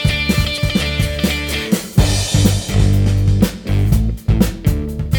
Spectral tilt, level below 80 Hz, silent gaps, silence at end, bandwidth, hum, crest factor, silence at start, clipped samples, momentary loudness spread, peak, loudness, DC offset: -5 dB/octave; -22 dBFS; none; 0 s; 20 kHz; none; 14 dB; 0 s; under 0.1%; 4 LU; 0 dBFS; -16 LUFS; under 0.1%